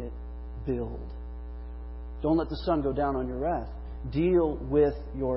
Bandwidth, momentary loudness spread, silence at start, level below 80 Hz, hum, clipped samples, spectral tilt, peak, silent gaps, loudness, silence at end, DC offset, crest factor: 5.8 kHz; 16 LU; 0 s; -38 dBFS; none; under 0.1%; -11.5 dB/octave; -14 dBFS; none; -29 LUFS; 0 s; under 0.1%; 16 dB